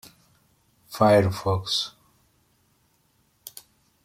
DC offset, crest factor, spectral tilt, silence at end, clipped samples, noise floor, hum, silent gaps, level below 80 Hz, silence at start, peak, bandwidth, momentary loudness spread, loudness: under 0.1%; 22 dB; -5.5 dB/octave; 2.15 s; under 0.1%; -66 dBFS; none; none; -60 dBFS; 0.9 s; -6 dBFS; 16.5 kHz; 25 LU; -22 LUFS